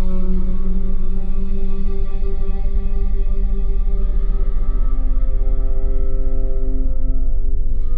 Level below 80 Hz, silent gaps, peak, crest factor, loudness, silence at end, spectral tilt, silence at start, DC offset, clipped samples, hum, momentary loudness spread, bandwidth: -14 dBFS; none; -6 dBFS; 8 dB; -25 LUFS; 0 s; -11 dB/octave; 0 s; under 0.1%; under 0.1%; none; 2 LU; 1.4 kHz